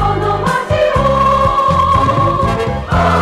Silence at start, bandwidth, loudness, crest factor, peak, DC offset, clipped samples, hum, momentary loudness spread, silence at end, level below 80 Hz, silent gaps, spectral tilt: 0 s; 15 kHz; -13 LUFS; 8 dB; -4 dBFS; under 0.1%; under 0.1%; none; 4 LU; 0 s; -26 dBFS; none; -6.5 dB/octave